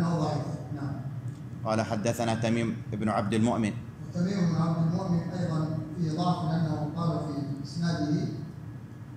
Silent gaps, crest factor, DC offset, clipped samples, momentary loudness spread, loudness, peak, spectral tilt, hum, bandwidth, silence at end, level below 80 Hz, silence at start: none; 16 dB; under 0.1%; under 0.1%; 10 LU; -30 LUFS; -14 dBFS; -7 dB/octave; none; 12.5 kHz; 0 s; -58 dBFS; 0 s